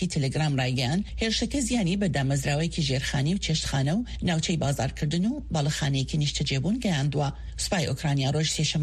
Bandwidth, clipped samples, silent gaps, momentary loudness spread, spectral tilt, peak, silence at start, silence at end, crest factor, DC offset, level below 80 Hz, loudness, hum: 13.5 kHz; under 0.1%; none; 3 LU; -5 dB/octave; -12 dBFS; 0 s; 0 s; 14 dB; under 0.1%; -40 dBFS; -26 LUFS; none